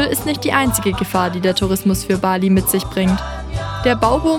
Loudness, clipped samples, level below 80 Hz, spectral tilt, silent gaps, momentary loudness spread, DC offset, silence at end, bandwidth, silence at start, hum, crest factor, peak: -17 LUFS; under 0.1%; -32 dBFS; -5 dB/octave; none; 5 LU; under 0.1%; 0 s; 18 kHz; 0 s; none; 16 dB; 0 dBFS